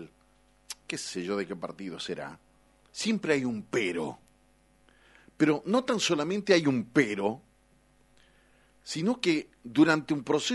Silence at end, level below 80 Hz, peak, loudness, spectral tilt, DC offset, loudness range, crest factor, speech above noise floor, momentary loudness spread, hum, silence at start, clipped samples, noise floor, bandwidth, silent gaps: 0 s; -68 dBFS; -8 dBFS; -29 LUFS; -4.5 dB/octave; under 0.1%; 5 LU; 22 dB; 36 dB; 14 LU; 50 Hz at -60 dBFS; 0 s; under 0.1%; -64 dBFS; 11.5 kHz; none